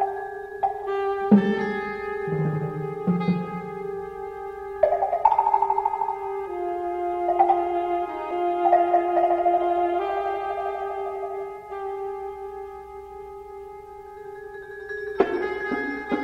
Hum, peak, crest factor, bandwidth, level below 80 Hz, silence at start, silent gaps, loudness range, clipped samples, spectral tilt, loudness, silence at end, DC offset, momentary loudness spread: none; -4 dBFS; 22 dB; 8.4 kHz; -56 dBFS; 0 s; none; 11 LU; under 0.1%; -8.5 dB/octave; -25 LUFS; 0 s; under 0.1%; 18 LU